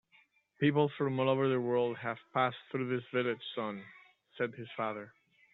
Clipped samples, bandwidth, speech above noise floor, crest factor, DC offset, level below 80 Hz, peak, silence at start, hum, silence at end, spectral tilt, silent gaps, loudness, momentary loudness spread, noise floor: under 0.1%; 4.2 kHz; 35 dB; 18 dB; under 0.1%; -78 dBFS; -16 dBFS; 0.6 s; none; 0.45 s; -5 dB/octave; none; -34 LUFS; 10 LU; -68 dBFS